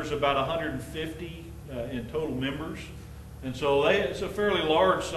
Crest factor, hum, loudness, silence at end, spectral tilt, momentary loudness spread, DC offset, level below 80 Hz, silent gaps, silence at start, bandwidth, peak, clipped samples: 20 dB; none; -28 LUFS; 0 s; -5 dB/octave; 17 LU; under 0.1%; -46 dBFS; none; 0 s; 13 kHz; -10 dBFS; under 0.1%